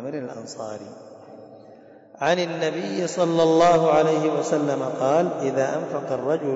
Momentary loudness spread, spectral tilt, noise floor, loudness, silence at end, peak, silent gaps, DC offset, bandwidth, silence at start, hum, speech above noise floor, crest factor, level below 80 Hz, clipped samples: 17 LU; -5.5 dB/octave; -47 dBFS; -22 LUFS; 0 s; -8 dBFS; none; under 0.1%; 8 kHz; 0 s; none; 26 dB; 14 dB; -62 dBFS; under 0.1%